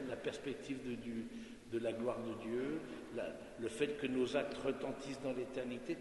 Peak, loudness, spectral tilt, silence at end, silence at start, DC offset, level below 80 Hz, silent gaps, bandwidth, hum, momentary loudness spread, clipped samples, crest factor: -22 dBFS; -42 LUFS; -5.5 dB/octave; 0 s; 0 s; under 0.1%; -68 dBFS; none; 11.5 kHz; none; 8 LU; under 0.1%; 20 dB